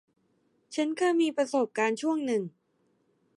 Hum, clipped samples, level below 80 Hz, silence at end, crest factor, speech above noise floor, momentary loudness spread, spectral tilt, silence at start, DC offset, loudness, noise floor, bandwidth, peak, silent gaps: none; under 0.1%; -86 dBFS; 0.9 s; 16 dB; 44 dB; 7 LU; -4.5 dB/octave; 0.7 s; under 0.1%; -28 LUFS; -71 dBFS; 11.5 kHz; -14 dBFS; none